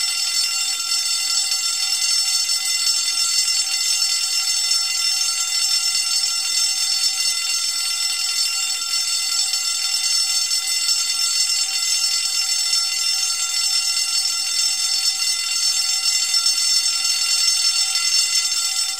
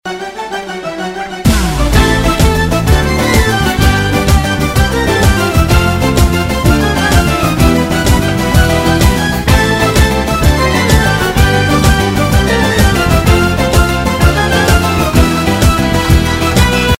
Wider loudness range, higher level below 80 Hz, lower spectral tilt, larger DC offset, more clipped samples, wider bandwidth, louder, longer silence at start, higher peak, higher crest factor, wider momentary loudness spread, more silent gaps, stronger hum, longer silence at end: about the same, 2 LU vs 1 LU; second, -68 dBFS vs -16 dBFS; second, 5 dB/octave vs -5 dB/octave; first, 0.4% vs under 0.1%; second, under 0.1% vs 0.4%; about the same, 16 kHz vs 16.5 kHz; second, -17 LUFS vs -11 LUFS; about the same, 0 s vs 0.05 s; second, -4 dBFS vs 0 dBFS; first, 16 dB vs 10 dB; about the same, 3 LU vs 3 LU; neither; neither; about the same, 0 s vs 0.05 s